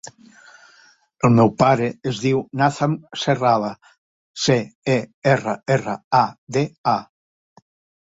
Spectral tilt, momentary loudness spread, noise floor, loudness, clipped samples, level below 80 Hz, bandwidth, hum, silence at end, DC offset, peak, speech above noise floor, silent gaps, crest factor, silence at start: -6 dB/octave; 8 LU; -54 dBFS; -20 LUFS; under 0.1%; -58 dBFS; 8 kHz; none; 1 s; under 0.1%; -2 dBFS; 35 dB; 3.98-4.34 s, 4.75-4.82 s, 5.14-5.22 s, 6.04-6.11 s, 6.38-6.47 s, 6.78-6.84 s; 20 dB; 1.25 s